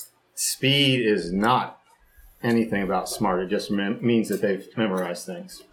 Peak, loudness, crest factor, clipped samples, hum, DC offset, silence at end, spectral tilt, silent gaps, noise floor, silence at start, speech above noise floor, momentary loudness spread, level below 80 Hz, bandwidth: -6 dBFS; -24 LUFS; 18 dB; under 0.1%; none; under 0.1%; 0.1 s; -4 dB/octave; none; -54 dBFS; 0 s; 30 dB; 12 LU; -54 dBFS; 18 kHz